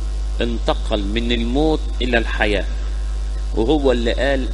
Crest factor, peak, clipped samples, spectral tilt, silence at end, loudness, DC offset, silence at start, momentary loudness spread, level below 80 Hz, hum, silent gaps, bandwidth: 18 dB; -2 dBFS; under 0.1%; -6 dB/octave; 0 s; -20 LUFS; under 0.1%; 0 s; 9 LU; -22 dBFS; 50 Hz at -20 dBFS; none; 10.5 kHz